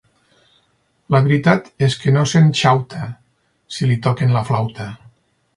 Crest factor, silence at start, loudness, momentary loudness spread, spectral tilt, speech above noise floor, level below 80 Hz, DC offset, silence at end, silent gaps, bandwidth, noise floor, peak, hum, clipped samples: 18 dB; 1.1 s; -16 LUFS; 17 LU; -6.5 dB/octave; 47 dB; -52 dBFS; under 0.1%; 0.6 s; none; 11 kHz; -62 dBFS; 0 dBFS; none; under 0.1%